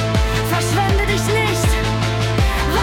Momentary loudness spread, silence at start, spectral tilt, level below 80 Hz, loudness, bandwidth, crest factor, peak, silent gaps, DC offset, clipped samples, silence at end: 2 LU; 0 s; -5 dB/octave; -24 dBFS; -17 LUFS; 17.5 kHz; 12 dB; -4 dBFS; none; under 0.1%; under 0.1%; 0 s